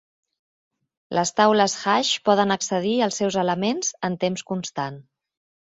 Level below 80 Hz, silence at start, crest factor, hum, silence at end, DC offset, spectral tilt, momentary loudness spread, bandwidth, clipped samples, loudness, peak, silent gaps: -66 dBFS; 1.1 s; 20 dB; none; 0.75 s; under 0.1%; -3.5 dB/octave; 10 LU; 8.2 kHz; under 0.1%; -22 LUFS; -4 dBFS; none